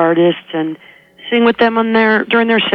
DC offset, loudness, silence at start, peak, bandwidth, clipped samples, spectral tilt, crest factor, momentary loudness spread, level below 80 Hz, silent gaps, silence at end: under 0.1%; -13 LUFS; 0 s; -2 dBFS; 5.6 kHz; under 0.1%; -7.5 dB/octave; 12 dB; 11 LU; -56 dBFS; none; 0 s